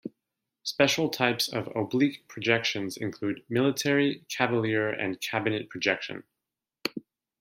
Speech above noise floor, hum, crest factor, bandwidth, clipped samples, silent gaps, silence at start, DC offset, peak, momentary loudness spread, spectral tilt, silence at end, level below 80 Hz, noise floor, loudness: 60 dB; none; 24 dB; 16.5 kHz; under 0.1%; none; 0.05 s; under 0.1%; -6 dBFS; 10 LU; -4.5 dB/octave; 0.4 s; -72 dBFS; -88 dBFS; -28 LUFS